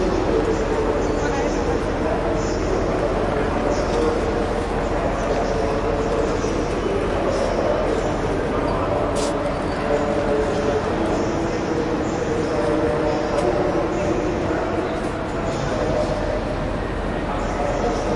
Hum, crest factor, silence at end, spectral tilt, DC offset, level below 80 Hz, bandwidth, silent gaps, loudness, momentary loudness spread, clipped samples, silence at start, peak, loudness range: none; 14 dB; 0 s; -6 dB/octave; under 0.1%; -32 dBFS; 11.5 kHz; none; -22 LUFS; 3 LU; under 0.1%; 0 s; -6 dBFS; 1 LU